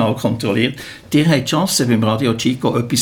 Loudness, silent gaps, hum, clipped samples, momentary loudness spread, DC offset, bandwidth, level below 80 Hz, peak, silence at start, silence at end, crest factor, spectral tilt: -16 LUFS; none; none; under 0.1%; 4 LU; under 0.1%; 18.5 kHz; -50 dBFS; -2 dBFS; 0 s; 0 s; 14 dB; -5 dB/octave